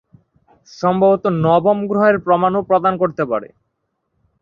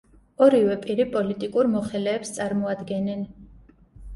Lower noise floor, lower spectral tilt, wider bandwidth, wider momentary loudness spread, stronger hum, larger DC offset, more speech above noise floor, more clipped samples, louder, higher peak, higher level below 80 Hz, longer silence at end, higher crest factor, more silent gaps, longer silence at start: first, -72 dBFS vs -51 dBFS; first, -8 dB/octave vs -6 dB/octave; second, 7 kHz vs 11.5 kHz; second, 7 LU vs 10 LU; neither; neither; first, 56 dB vs 29 dB; neither; first, -16 LUFS vs -24 LUFS; about the same, -2 dBFS vs -4 dBFS; about the same, -54 dBFS vs -52 dBFS; first, 0.95 s vs 0 s; about the same, 16 dB vs 20 dB; neither; first, 0.8 s vs 0.4 s